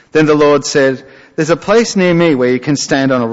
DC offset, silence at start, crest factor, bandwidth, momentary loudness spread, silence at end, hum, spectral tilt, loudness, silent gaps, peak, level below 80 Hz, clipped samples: under 0.1%; 0.15 s; 10 dB; 8 kHz; 6 LU; 0 s; none; -5 dB/octave; -12 LUFS; none; -2 dBFS; -48 dBFS; under 0.1%